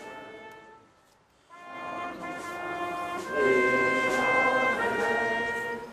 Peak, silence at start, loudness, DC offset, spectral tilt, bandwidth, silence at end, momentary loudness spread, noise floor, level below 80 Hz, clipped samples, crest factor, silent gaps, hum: -12 dBFS; 0 s; -27 LUFS; under 0.1%; -4 dB/octave; 15 kHz; 0 s; 20 LU; -62 dBFS; -62 dBFS; under 0.1%; 16 dB; none; none